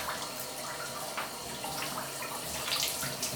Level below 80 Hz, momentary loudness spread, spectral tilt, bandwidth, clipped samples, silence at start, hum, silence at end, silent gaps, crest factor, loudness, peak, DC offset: -62 dBFS; 7 LU; -1.5 dB/octave; over 20 kHz; under 0.1%; 0 s; none; 0 s; none; 20 dB; -34 LUFS; -16 dBFS; under 0.1%